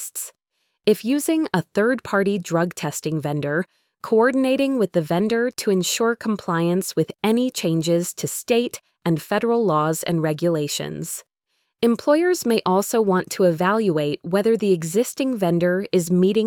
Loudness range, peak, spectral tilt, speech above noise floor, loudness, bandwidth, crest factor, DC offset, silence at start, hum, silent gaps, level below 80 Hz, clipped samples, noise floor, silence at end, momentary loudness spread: 2 LU; -4 dBFS; -5 dB/octave; 53 dB; -21 LUFS; 19 kHz; 16 dB; under 0.1%; 0 s; none; none; -62 dBFS; under 0.1%; -73 dBFS; 0 s; 7 LU